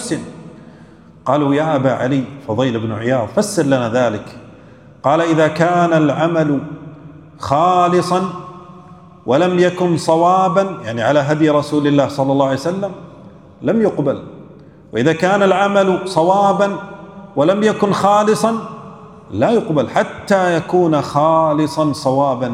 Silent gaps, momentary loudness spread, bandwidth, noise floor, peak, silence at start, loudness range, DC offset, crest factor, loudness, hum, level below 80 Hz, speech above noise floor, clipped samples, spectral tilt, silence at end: none; 14 LU; 14.5 kHz; -42 dBFS; 0 dBFS; 0 s; 3 LU; under 0.1%; 16 dB; -15 LUFS; none; -56 dBFS; 27 dB; under 0.1%; -6 dB/octave; 0 s